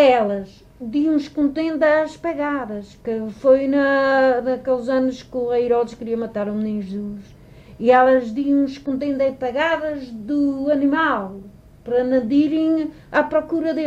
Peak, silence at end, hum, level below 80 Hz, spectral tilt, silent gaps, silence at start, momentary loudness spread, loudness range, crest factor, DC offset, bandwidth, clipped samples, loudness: -4 dBFS; 0 s; none; -52 dBFS; -6.5 dB/octave; none; 0 s; 12 LU; 3 LU; 16 dB; under 0.1%; 8 kHz; under 0.1%; -20 LUFS